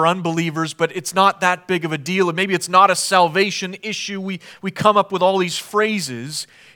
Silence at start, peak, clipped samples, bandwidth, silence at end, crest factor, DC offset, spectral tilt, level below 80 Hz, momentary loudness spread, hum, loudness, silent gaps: 0 s; 0 dBFS; under 0.1%; 19 kHz; 0.3 s; 18 dB; under 0.1%; -4 dB/octave; -66 dBFS; 12 LU; none; -18 LUFS; none